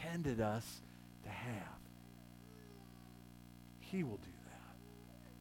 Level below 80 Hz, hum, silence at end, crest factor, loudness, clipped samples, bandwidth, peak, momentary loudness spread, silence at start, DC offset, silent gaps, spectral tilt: -64 dBFS; 60 Hz at -60 dBFS; 0 s; 20 dB; -45 LUFS; under 0.1%; 19 kHz; -28 dBFS; 19 LU; 0 s; under 0.1%; none; -6 dB/octave